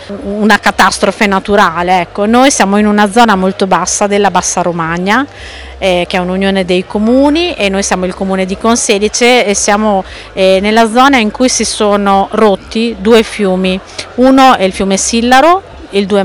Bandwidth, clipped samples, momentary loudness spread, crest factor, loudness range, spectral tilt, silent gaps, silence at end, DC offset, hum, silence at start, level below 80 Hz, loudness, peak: over 20 kHz; 2%; 7 LU; 10 dB; 3 LU; -3.5 dB/octave; none; 0 s; under 0.1%; none; 0 s; -34 dBFS; -9 LUFS; 0 dBFS